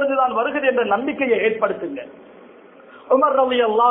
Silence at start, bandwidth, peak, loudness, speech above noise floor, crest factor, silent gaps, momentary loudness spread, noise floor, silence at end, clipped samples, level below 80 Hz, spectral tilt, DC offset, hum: 0 s; 3.9 kHz; -4 dBFS; -19 LUFS; 26 dB; 16 dB; none; 12 LU; -45 dBFS; 0 s; under 0.1%; -64 dBFS; -8.5 dB/octave; under 0.1%; none